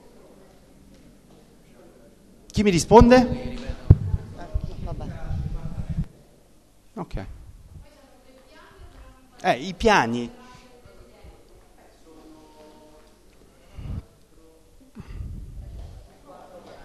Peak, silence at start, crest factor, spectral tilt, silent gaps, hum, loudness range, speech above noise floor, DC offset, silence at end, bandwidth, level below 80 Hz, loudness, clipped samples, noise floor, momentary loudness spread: 0 dBFS; 2.55 s; 26 dB; -6 dB/octave; none; none; 24 LU; 37 dB; under 0.1%; 0 s; 13 kHz; -34 dBFS; -22 LUFS; under 0.1%; -55 dBFS; 26 LU